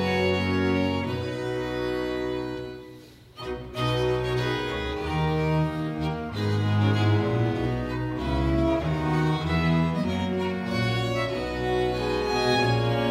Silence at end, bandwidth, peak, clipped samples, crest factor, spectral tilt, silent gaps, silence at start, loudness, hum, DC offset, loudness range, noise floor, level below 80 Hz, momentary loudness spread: 0 s; 14.5 kHz; -10 dBFS; under 0.1%; 14 dB; -7 dB/octave; none; 0 s; -26 LUFS; none; under 0.1%; 4 LU; -47 dBFS; -40 dBFS; 7 LU